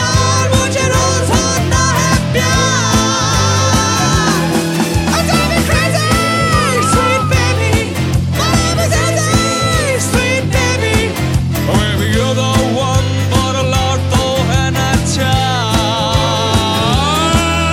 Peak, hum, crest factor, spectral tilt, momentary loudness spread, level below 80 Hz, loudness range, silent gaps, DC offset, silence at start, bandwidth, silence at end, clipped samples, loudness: 0 dBFS; none; 12 dB; -4 dB/octave; 2 LU; -24 dBFS; 2 LU; none; under 0.1%; 0 s; 16.5 kHz; 0 s; under 0.1%; -13 LUFS